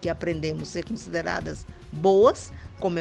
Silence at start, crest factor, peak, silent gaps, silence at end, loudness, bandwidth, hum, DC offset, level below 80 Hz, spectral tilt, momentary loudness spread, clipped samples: 0 s; 20 dB; -6 dBFS; none; 0 s; -25 LUFS; 9.6 kHz; none; under 0.1%; -46 dBFS; -6 dB/octave; 19 LU; under 0.1%